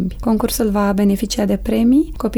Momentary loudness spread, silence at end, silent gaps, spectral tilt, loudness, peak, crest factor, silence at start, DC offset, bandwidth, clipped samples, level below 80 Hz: 4 LU; 0 s; none; -6 dB/octave; -17 LUFS; -6 dBFS; 10 dB; 0 s; under 0.1%; over 20 kHz; under 0.1%; -32 dBFS